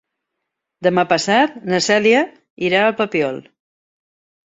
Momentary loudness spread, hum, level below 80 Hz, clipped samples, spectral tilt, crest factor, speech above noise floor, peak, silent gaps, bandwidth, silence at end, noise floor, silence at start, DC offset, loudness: 10 LU; none; -64 dBFS; under 0.1%; -4 dB/octave; 18 dB; 62 dB; 0 dBFS; 2.50-2.57 s; 8.4 kHz; 1.1 s; -78 dBFS; 0.8 s; under 0.1%; -17 LUFS